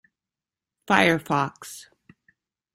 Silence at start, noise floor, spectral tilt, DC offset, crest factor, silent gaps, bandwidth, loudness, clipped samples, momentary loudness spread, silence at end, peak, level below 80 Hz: 0.9 s; -90 dBFS; -4.5 dB/octave; under 0.1%; 24 dB; none; 16 kHz; -22 LUFS; under 0.1%; 21 LU; 0.95 s; -2 dBFS; -64 dBFS